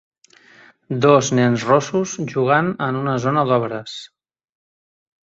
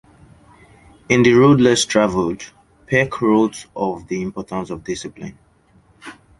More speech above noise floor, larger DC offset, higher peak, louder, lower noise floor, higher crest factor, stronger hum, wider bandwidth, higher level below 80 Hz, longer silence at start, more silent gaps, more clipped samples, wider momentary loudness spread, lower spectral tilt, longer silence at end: second, 32 dB vs 37 dB; neither; about the same, -2 dBFS vs 0 dBFS; about the same, -18 LUFS vs -17 LUFS; second, -50 dBFS vs -54 dBFS; about the same, 18 dB vs 18 dB; neither; second, 8 kHz vs 11.5 kHz; second, -60 dBFS vs -50 dBFS; second, 0.9 s vs 1.1 s; neither; neither; second, 13 LU vs 23 LU; about the same, -5.5 dB/octave vs -5 dB/octave; first, 1.2 s vs 0.3 s